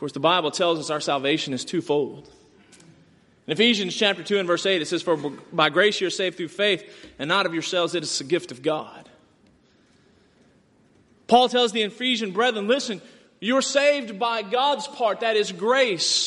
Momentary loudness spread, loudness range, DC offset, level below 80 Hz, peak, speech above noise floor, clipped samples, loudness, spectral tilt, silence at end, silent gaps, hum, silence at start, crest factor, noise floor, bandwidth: 8 LU; 5 LU; under 0.1%; -70 dBFS; -2 dBFS; 36 dB; under 0.1%; -22 LUFS; -3 dB/octave; 0 s; none; none; 0 s; 22 dB; -59 dBFS; 11.5 kHz